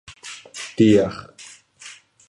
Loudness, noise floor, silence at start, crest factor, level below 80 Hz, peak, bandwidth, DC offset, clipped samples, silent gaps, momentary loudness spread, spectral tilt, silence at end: -18 LUFS; -46 dBFS; 0.25 s; 20 dB; -54 dBFS; -4 dBFS; 11.5 kHz; under 0.1%; under 0.1%; none; 25 LU; -6 dB/octave; 0.4 s